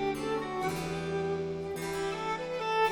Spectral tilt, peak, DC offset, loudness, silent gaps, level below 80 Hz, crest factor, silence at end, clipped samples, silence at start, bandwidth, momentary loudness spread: -5 dB/octave; -18 dBFS; under 0.1%; -33 LUFS; none; -56 dBFS; 14 dB; 0 s; under 0.1%; 0 s; 18 kHz; 3 LU